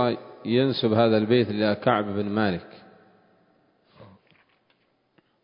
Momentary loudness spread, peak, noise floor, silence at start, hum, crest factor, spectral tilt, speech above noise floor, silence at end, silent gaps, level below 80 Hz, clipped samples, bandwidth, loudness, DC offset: 7 LU; -6 dBFS; -68 dBFS; 0 s; none; 20 dB; -11 dB/octave; 45 dB; 1.4 s; none; -60 dBFS; under 0.1%; 5.4 kHz; -23 LUFS; under 0.1%